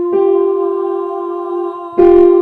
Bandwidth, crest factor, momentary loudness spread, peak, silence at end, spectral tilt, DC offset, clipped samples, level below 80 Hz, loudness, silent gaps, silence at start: 4 kHz; 12 dB; 13 LU; 0 dBFS; 0 s; -9 dB/octave; under 0.1%; under 0.1%; -42 dBFS; -13 LUFS; none; 0 s